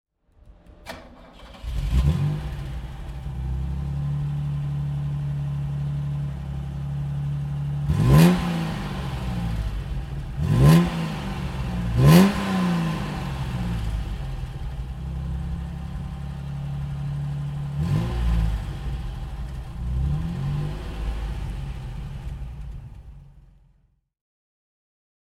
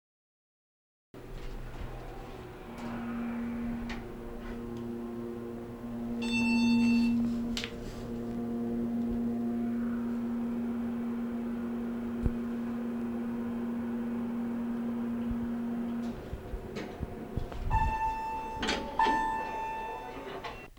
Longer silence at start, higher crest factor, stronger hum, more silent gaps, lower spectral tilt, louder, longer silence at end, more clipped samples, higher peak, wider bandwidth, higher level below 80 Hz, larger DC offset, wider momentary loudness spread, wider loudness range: second, 0.45 s vs 1.15 s; about the same, 24 dB vs 20 dB; neither; neither; about the same, -7 dB/octave vs -6 dB/octave; first, -25 LUFS vs -34 LUFS; first, 1.9 s vs 0 s; neither; first, -2 dBFS vs -14 dBFS; about the same, 16 kHz vs 16.5 kHz; first, -32 dBFS vs -46 dBFS; neither; first, 17 LU vs 13 LU; about the same, 11 LU vs 9 LU